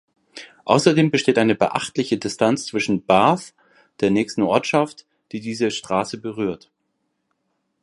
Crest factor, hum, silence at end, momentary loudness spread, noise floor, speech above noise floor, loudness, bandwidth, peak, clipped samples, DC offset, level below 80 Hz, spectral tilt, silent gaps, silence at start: 20 dB; none; 1.25 s; 13 LU; -73 dBFS; 53 dB; -20 LUFS; 11.5 kHz; 0 dBFS; under 0.1%; under 0.1%; -60 dBFS; -5 dB/octave; none; 0.35 s